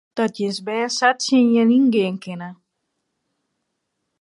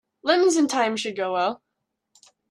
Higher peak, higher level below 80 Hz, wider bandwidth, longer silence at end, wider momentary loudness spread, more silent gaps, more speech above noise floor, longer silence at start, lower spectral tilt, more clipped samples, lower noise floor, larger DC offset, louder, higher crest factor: first, -2 dBFS vs -6 dBFS; about the same, -72 dBFS vs -76 dBFS; about the same, 11.5 kHz vs 12.5 kHz; first, 1.7 s vs 0.95 s; first, 16 LU vs 8 LU; neither; about the same, 57 dB vs 58 dB; about the same, 0.15 s vs 0.25 s; first, -4.5 dB/octave vs -2.5 dB/octave; neither; second, -76 dBFS vs -80 dBFS; neither; first, -18 LUFS vs -22 LUFS; about the same, 18 dB vs 18 dB